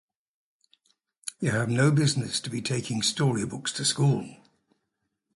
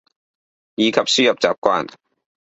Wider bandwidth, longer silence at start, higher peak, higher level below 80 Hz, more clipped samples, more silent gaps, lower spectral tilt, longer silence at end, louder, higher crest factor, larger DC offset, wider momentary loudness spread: first, 11.5 kHz vs 8.4 kHz; first, 1.25 s vs 0.8 s; second, -10 dBFS vs 0 dBFS; about the same, -62 dBFS vs -62 dBFS; neither; second, none vs 1.58-1.62 s; first, -4.5 dB/octave vs -3 dB/octave; first, 1 s vs 0.55 s; second, -26 LUFS vs -17 LUFS; about the same, 18 dB vs 20 dB; neither; second, 9 LU vs 14 LU